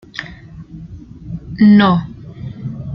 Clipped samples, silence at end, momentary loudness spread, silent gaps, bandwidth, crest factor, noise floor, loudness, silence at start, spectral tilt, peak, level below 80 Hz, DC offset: under 0.1%; 0 s; 26 LU; none; 5.8 kHz; 14 dB; -35 dBFS; -11 LUFS; 0.15 s; -8.5 dB/octave; -2 dBFS; -42 dBFS; under 0.1%